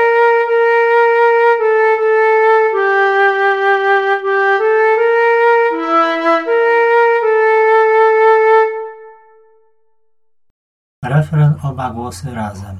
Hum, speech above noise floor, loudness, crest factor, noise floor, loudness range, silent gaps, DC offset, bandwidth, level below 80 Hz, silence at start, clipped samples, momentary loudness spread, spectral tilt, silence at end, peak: none; 49 dB; -12 LUFS; 12 dB; -72 dBFS; 9 LU; 10.50-11.02 s; under 0.1%; 10.5 kHz; -54 dBFS; 0 s; under 0.1%; 10 LU; -7 dB/octave; 0 s; -2 dBFS